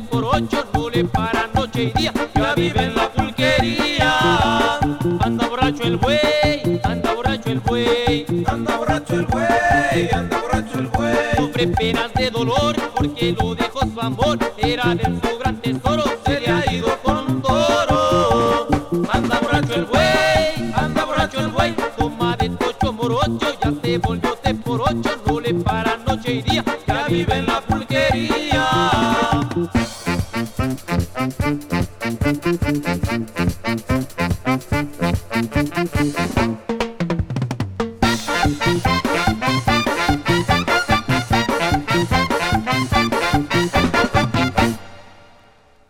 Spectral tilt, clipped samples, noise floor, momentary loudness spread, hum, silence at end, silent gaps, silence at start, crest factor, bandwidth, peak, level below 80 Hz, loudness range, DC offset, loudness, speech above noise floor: -5.5 dB/octave; under 0.1%; -50 dBFS; 6 LU; none; 0.75 s; none; 0 s; 16 dB; 17.5 kHz; -2 dBFS; -34 dBFS; 4 LU; under 0.1%; -19 LUFS; 32 dB